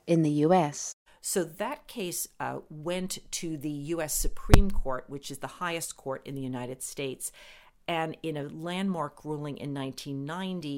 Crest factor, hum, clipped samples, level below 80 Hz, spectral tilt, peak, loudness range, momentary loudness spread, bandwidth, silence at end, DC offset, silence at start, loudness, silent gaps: 26 dB; none; under 0.1%; -36 dBFS; -5 dB/octave; -2 dBFS; 5 LU; 13 LU; 17 kHz; 0 s; under 0.1%; 0.05 s; -31 LUFS; 0.93-1.06 s